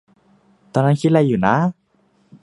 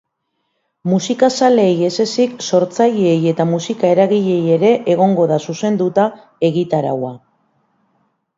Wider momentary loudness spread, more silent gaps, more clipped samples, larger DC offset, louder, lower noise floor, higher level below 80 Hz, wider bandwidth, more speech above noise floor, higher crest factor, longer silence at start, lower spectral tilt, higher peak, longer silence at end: about the same, 7 LU vs 6 LU; neither; neither; neither; about the same, -17 LUFS vs -15 LUFS; second, -60 dBFS vs -71 dBFS; first, -54 dBFS vs -64 dBFS; first, 11 kHz vs 7.8 kHz; second, 44 dB vs 56 dB; about the same, 18 dB vs 16 dB; about the same, 0.75 s vs 0.85 s; first, -8 dB/octave vs -6 dB/octave; about the same, 0 dBFS vs 0 dBFS; second, 0.7 s vs 1.2 s